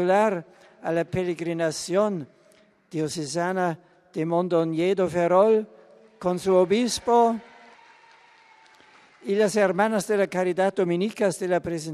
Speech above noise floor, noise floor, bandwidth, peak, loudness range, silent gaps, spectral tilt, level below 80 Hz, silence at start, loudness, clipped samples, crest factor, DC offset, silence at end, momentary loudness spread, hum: 35 dB; -58 dBFS; 14 kHz; -6 dBFS; 5 LU; none; -5.5 dB/octave; -62 dBFS; 0 s; -24 LUFS; under 0.1%; 18 dB; under 0.1%; 0 s; 12 LU; none